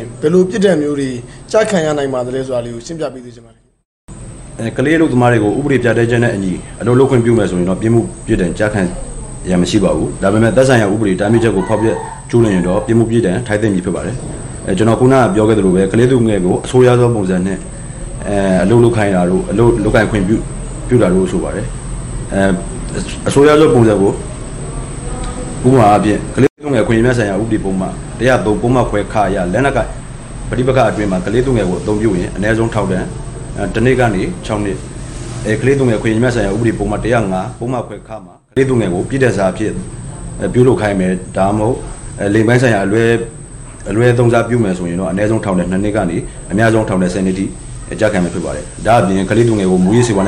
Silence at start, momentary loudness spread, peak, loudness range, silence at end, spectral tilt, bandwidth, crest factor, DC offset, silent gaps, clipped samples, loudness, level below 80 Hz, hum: 0 s; 14 LU; 0 dBFS; 4 LU; 0 s; -6.5 dB/octave; 11.5 kHz; 12 dB; under 0.1%; 3.85-4.08 s, 26.50-26.56 s; under 0.1%; -13 LUFS; -30 dBFS; none